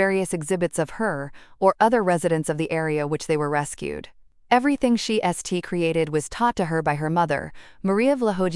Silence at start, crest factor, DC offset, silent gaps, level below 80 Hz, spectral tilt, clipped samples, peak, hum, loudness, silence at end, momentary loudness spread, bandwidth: 0 s; 20 dB; under 0.1%; none; -52 dBFS; -5.5 dB/octave; under 0.1%; -4 dBFS; none; -23 LUFS; 0 s; 9 LU; 12 kHz